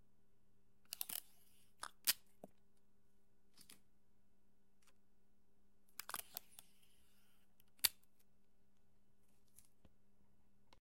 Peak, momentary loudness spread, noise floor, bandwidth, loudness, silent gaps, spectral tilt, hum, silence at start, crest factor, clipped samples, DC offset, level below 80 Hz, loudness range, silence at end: -16 dBFS; 25 LU; -80 dBFS; 16.5 kHz; -44 LUFS; none; 1.5 dB/octave; none; 0.9 s; 38 dB; under 0.1%; under 0.1%; -82 dBFS; 9 LU; 2.9 s